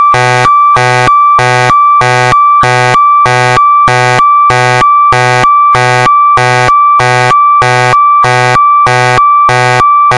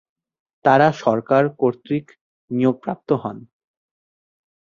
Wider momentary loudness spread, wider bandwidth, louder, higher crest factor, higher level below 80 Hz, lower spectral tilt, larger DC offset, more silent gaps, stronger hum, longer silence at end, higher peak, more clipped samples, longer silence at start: second, 1 LU vs 13 LU; first, 11.5 kHz vs 7.4 kHz; first, -5 LUFS vs -20 LUFS; second, 6 dB vs 20 dB; first, -36 dBFS vs -62 dBFS; second, -4 dB/octave vs -7.5 dB/octave; first, 0.4% vs under 0.1%; second, none vs 2.21-2.48 s; neither; second, 0 s vs 1.25 s; about the same, 0 dBFS vs -2 dBFS; first, 0.3% vs under 0.1%; second, 0 s vs 0.65 s